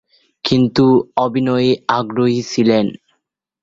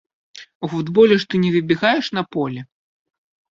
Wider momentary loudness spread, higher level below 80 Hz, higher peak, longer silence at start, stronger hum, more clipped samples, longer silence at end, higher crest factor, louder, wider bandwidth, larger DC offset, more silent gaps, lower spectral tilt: second, 5 LU vs 13 LU; first, -52 dBFS vs -62 dBFS; about the same, -2 dBFS vs -2 dBFS; about the same, 0.45 s vs 0.35 s; neither; neither; second, 0.7 s vs 0.85 s; about the same, 14 dB vs 18 dB; about the same, -16 LUFS vs -18 LUFS; about the same, 7.6 kHz vs 7.4 kHz; neither; second, none vs 0.55-0.61 s; about the same, -6.5 dB/octave vs -6.5 dB/octave